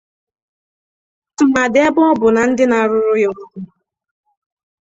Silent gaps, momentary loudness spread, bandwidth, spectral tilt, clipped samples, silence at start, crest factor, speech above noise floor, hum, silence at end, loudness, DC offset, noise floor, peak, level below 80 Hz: none; 19 LU; 8 kHz; -5 dB/octave; under 0.1%; 1.4 s; 16 dB; over 77 dB; none; 1.2 s; -14 LUFS; under 0.1%; under -90 dBFS; -2 dBFS; -54 dBFS